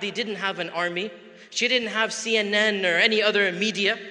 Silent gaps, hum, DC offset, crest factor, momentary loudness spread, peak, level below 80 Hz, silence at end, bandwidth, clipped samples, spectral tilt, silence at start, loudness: none; none; under 0.1%; 20 dB; 9 LU; -4 dBFS; -76 dBFS; 0 s; 11 kHz; under 0.1%; -2.5 dB/octave; 0 s; -22 LUFS